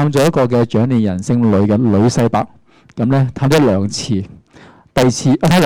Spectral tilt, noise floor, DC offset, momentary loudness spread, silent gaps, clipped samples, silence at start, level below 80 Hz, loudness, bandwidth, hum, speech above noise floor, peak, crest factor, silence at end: -6.5 dB/octave; -43 dBFS; under 0.1%; 8 LU; none; under 0.1%; 0 s; -42 dBFS; -14 LUFS; 17.5 kHz; none; 30 dB; -4 dBFS; 8 dB; 0 s